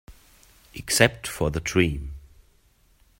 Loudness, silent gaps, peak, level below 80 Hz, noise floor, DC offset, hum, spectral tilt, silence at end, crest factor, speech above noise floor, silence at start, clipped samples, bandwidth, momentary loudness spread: -23 LUFS; none; -2 dBFS; -42 dBFS; -61 dBFS; under 0.1%; none; -4 dB/octave; 1 s; 26 dB; 37 dB; 0.1 s; under 0.1%; 16.5 kHz; 21 LU